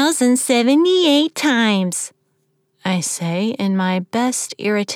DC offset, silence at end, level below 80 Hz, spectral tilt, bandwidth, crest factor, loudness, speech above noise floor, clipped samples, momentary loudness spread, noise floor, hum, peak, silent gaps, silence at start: under 0.1%; 0 s; -82 dBFS; -4 dB/octave; 17.5 kHz; 14 dB; -17 LUFS; 49 dB; under 0.1%; 8 LU; -66 dBFS; none; -4 dBFS; none; 0 s